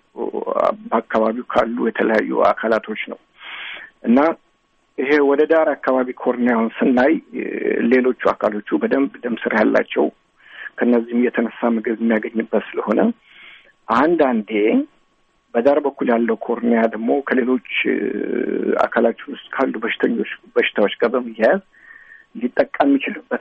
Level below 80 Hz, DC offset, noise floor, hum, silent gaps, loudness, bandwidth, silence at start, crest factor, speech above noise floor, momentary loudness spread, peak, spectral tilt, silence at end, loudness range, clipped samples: -60 dBFS; under 0.1%; -62 dBFS; none; none; -19 LUFS; 6.6 kHz; 0.15 s; 16 dB; 44 dB; 10 LU; -4 dBFS; -7.5 dB/octave; 0 s; 2 LU; under 0.1%